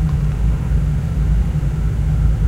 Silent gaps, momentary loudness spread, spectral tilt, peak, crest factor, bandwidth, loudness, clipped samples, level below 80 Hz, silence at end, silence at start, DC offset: none; 2 LU; -8.5 dB/octave; -4 dBFS; 12 dB; 8.2 kHz; -19 LUFS; under 0.1%; -18 dBFS; 0 s; 0 s; under 0.1%